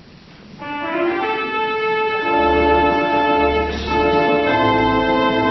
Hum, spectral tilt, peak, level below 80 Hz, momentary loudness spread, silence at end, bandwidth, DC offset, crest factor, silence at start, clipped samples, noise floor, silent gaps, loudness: none; -6.5 dB/octave; -4 dBFS; -36 dBFS; 5 LU; 0 s; 6.2 kHz; under 0.1%; 14 dB; 0.35 s; under 0.1%; -42 dBFS; none; -17 LUFS